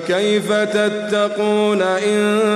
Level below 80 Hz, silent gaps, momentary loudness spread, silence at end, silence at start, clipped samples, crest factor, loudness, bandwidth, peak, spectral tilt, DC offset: -64 dBFS; none; 2 LU; 0 s; 0 s; under 0.1%; 10 dB; -17 LUFS; 13 kHz; -6 dBFS; -4.5 dB/octave; under 0.1%